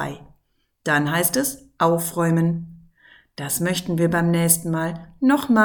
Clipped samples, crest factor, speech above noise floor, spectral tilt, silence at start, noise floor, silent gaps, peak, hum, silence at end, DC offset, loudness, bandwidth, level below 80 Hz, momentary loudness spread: under 0.1%; 20 dB; 48 dB; -4.5 dB/octave; 0 s; -68 dBFS; none; -2 dBFS; none; 0 s; under 0.1%; -21 LUFS; 19.5 kHz; -54 dBFS; 13 LU